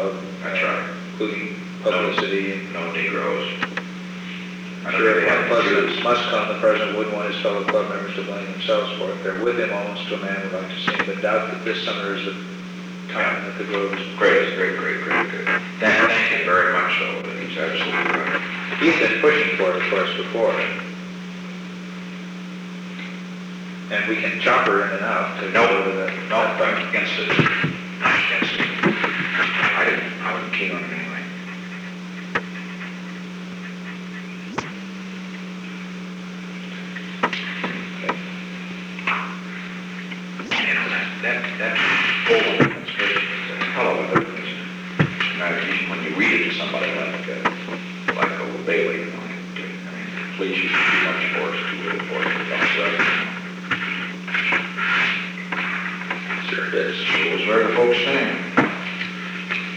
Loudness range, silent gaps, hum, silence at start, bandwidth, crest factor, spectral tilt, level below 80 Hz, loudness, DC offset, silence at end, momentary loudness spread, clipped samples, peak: 9 LU; none; none; 0 s; 10.5 kHz; 20 dB; -5 dB/octave; -64 dBFS; -21 LUFS; under 0.1%; 0 s; 15 LU; under 0.1%; -2 dBFS